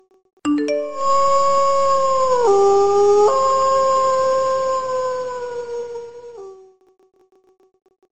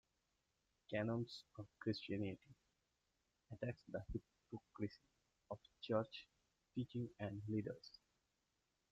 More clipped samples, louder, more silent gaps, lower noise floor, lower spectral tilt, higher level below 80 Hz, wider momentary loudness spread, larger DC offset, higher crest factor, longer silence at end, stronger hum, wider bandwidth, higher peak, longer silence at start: neither; first, -17 LUFS vs -48 LUFS; neither; second, -43 dBFS vs -87 dBFS; second, -4 dB/octave vs -7.5 dB/octave; first, -50 dBFS vs -70 dBFS; about the same, 14 LU vs 14 LU; neither; second, 14 dB vs 22 dB; second, 0 s vs 1.05 s; neither; about the same, 8.8 kHz vs 8 kHz; first, -6 dBFS vs -26 dBFS; second, 0 s vs 0.9 s